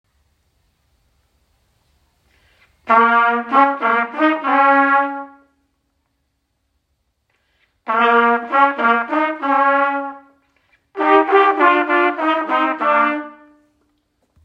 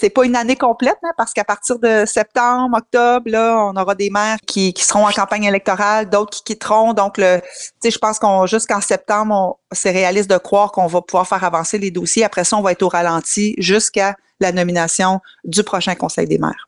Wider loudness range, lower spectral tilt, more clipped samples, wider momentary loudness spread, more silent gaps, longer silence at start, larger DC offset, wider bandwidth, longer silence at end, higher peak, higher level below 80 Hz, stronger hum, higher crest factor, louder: first, 6 LU vs 1 LU; first, -5 dB/octave vs -3.5 dB/octave; neither; first, 12 LU vs 5 LU; neither; first, 2.85 s vs 0 s; neither; second, 7 kHz vs 11.5 kHz; first, 1.1 s vs 0.05 s; about the same, 0 dBFS vs -2 dBFS; second, -68 dBFS vs -54 dBFS; neither; about the same, 18 dB vs 14 dB; about the same, -15 LUFS vs -15 LUFS